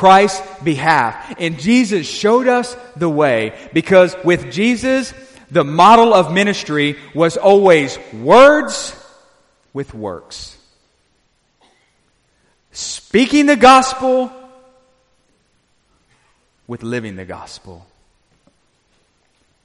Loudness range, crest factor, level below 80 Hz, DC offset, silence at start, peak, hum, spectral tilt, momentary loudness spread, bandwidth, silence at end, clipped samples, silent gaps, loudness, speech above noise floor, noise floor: 19 LU; 16 dB; -50 dBFS; under 0.1%; 0 s; 0 dBFS; none; -4.5 dB/octave; 21 LU; 11.5 kHz; 1.9 s; under 0.1%; none; -13 LUFS; 48 dB; -61 dBFS